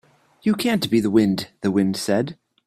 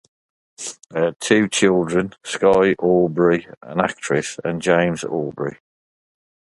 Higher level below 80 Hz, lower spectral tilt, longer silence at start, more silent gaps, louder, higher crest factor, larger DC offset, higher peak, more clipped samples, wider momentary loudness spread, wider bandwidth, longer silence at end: second, -60 dBFS vs -54 dBFS; about the same, -5.5 dB/octave vs -5 dB/octave; second, 0.45 s vs 0.6 s; second, none vs 3.57-3.61 s; about the same, -21 LUFS vs -19 LUFS; about the same, 16 dB vs 20 dB; neither; second, -4 dBFS vs 0 dBFS; neither; second, 6 LU vs 11 LU; first, 15 kHz vs 11.5 kHz; second, 0.35 s vs 1.05 s